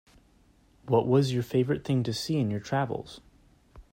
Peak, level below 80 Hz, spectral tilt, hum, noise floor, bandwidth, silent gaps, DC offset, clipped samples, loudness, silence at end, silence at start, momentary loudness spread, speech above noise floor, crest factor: -10 dBFS; -58 dBFS; -7 dB/octave; none; -62 dBFS; 16 kHz; none; under 0.1%; under 0.1%; -28 LUFS; 0.1 s; 0.85 s; 8 LU; 35 dB; 18 dB